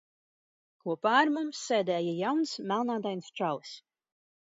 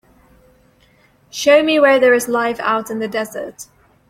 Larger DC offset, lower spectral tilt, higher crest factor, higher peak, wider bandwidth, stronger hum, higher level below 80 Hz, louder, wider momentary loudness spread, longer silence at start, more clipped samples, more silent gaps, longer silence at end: neither; first, -4.5 dB/octave vs -3 dB/octave; about the same, 20 dB vs 16 dB; second, -12 dBFS vs -2 dBFS; second, 7.8 kHz vs 16 kHz; neither; second, -84 dBFS vs -58 dBFS; second, -30 LUFS vs -15 LUFS; second, 13 LU vs 19 LU; second, 0.85 s vs 1.35 s; neither; neither; first, 0.75 s vs 0.45 s